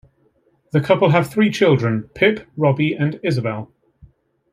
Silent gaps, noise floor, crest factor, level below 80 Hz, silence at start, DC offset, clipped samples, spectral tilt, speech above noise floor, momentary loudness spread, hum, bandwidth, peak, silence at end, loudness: none; -61 dBFS; 18 dB; -56 dBFS; 0.75 s; under 0.1%; under 0.1%; -7 dB/octave; 43 dB; 8 LU; none; 15 kHz; -2 dBFS; 0.85 s; -18 LUFS